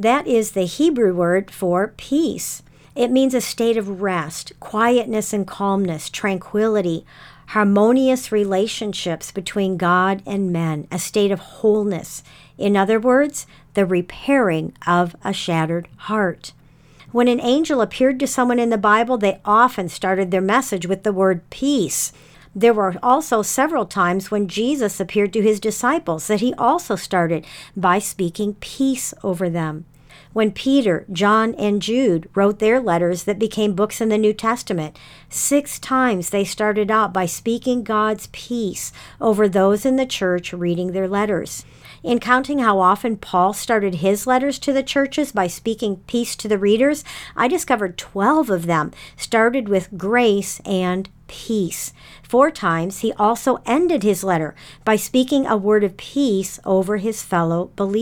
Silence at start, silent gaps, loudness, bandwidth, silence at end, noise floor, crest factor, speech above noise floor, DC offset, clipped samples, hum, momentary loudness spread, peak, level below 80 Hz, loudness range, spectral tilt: 0 s; none; -19 LUFS; 19 kHz; 0 s; -48 dBFS; 18 dB; 29 dB; under 0.1%; under 0.1%; none; 9 LU; -2 dBFS; -52 dBFS; 3 LU; -5 dB/octave